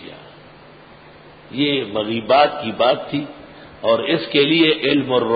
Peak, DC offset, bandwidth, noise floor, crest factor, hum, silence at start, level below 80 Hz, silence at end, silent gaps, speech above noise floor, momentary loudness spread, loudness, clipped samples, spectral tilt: -2 dBFS; under 0.1%; 5 kHz; -43 dBFS; 18 dB; none; 0 s; -56 dBFS; 0 s; none; 26 dB; 13 LU; -18 LUFS; under 0.1%; -10 dB/octave